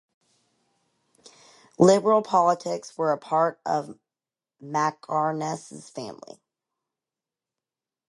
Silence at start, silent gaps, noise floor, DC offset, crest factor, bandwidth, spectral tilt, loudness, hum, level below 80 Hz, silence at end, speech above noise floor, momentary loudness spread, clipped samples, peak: 1.8 s; none; under -90 dBFS; under 0.1%; 22 dB; 11.5 kHz; -5.5 dB/octave; -24 LUFS; none; -72 dBFS; 1.95 s; over 66 dB; 19 LU; under 0.1%; -4 dBFS